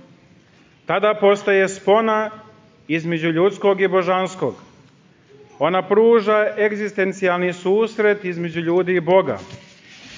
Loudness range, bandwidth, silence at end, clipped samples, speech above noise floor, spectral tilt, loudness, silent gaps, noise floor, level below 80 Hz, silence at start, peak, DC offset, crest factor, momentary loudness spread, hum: 3 LU; 7.6 kHz; 0 s; under 0.1%; 34 dB; -6 dB/octave; -18 LUFS; none; -52 dBFS; -64 dBFS; 0.9 s; -4 dBFS; under 0.1%; 16 dB; 9 LU; none